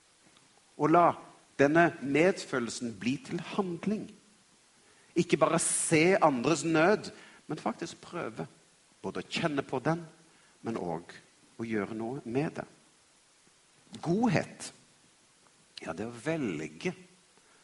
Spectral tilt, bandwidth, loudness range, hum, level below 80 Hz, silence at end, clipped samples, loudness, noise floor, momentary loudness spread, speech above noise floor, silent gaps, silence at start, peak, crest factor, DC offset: -5 dB/octave; 11.5 kHz; 10 LU; none; -70 dBFS; 0.6 s; under 0.1%; -30 LUFS; -64 dBFS; 19 LU; 34 dB; none; 0.8 s; -8 dBFS; 24 dB; under 0.1%